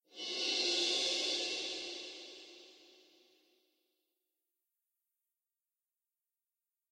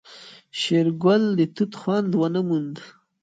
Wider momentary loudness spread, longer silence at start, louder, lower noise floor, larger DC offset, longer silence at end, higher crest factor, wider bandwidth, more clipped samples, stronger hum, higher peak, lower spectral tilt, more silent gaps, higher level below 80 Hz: about the same, 19 LU vs 17 LU; about the same, 0.1 s vs 0.1 s; second, -34 LUFS vs -22 LUFS; first, under -90 dBFS vs -46 dBFS; neither; first, 4 s vs 0.35 s; about the same, 20 dB vs 16 dB; first, 16 kHz vs 9.2 kHz; neither; neither; second, -22 dBFS vs -6 dBFS; second, 1 dB/octave vs -6.5 dB/octave; neither; second, -88 dBFS vs -70 dBFS